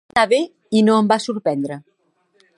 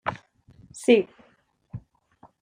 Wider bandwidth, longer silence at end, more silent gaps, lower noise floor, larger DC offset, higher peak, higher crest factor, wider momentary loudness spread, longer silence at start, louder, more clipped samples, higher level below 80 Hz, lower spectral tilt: about the same, 11 kHz vs 12 kHz; first, 0.8 s vs 0.65 s; neither; about the same, -64 dBFS vs -63 dBFS; neither; first, -2 dBFS vs -6 dBFS; about the same, 18 dB vs 22 dB; second, 11 LU vs 24 LU; about the same, 0.15 s vs 0.05 s; first, -18 LUFS vs -23 LUFS; neither; about the same, -60 dBFS vs -62 dBFS; about the same, -5.5 dB/octave vs -5 dB/octave